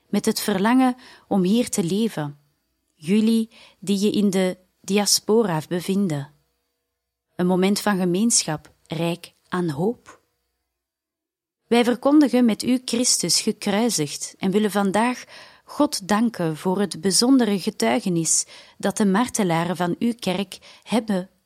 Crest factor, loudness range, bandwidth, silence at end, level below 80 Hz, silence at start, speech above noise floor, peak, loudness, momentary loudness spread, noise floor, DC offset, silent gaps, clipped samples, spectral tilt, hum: 18 dB; 4 LU; 16.5 kHz; 0.2 s; -64 dBFS; 0.1 s; 65 dB; -4 dBFS; -21 LUFS; 13 LU; -87 dBFS; under 0.1%; none; under 0.1%; -4 dB/octave; none